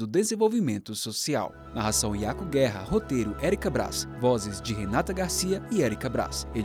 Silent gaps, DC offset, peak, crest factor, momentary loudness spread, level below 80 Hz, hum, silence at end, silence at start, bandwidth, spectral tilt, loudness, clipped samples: none; under 0.1%; -12 dBFS; 16 dB; 6 LU; -44 dBFS; none; 0 s; 0 s; 19 kHz; -4.5 dB/octave; -28 LUFS; under 0.1%